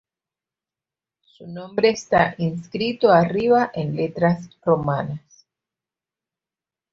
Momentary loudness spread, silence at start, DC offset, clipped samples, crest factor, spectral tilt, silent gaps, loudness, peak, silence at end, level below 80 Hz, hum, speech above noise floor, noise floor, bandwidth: 13 LU; 1.4 s; under 0.1%; under 0.1%; 20 dB; -6.5 dB/octave; none; -20 LUFS; -2 dBFS; 1.75 s; -56 dBFS; none; over 70 dB; under -90 dBFS; 7.6 kHz